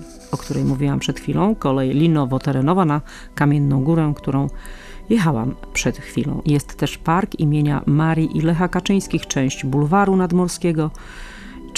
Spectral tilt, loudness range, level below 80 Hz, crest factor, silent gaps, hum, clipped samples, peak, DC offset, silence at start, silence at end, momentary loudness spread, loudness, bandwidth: -6.5 dB/octave; 2 LU; -38 dBFS; 14 dB; none; none; under 0.1%; -4 dBFS; under 0.1%; 0 s; 0 s; 10 LU; -19 LUFS; 14 kHz